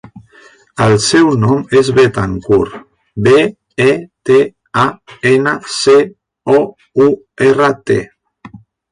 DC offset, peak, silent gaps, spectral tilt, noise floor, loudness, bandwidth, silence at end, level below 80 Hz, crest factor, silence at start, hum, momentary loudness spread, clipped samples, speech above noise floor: under 0.1%; 0 dBFS; none; -5.5 dB/octave; -44 dBFS; -12 LUFS; 10.5 kHz; 0.35 s; -44 dBFS; 12 dB; 0.15 s; none; 8 LU; under 0.1%; 33 dB